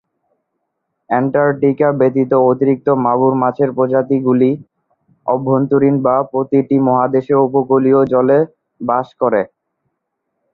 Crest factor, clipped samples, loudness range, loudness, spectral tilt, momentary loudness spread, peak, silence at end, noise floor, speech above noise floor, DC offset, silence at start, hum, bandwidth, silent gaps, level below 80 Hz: 14 dB; under 0.1%; 2 LU; -14 LUFS; -11.5 dB/octave; 6 LU; 0 dBFS; 1.05 s; -73 dBFS; 60 dB; under 0.1%; 1.1 s; none; 4.1 kHz; none; -58 dBFS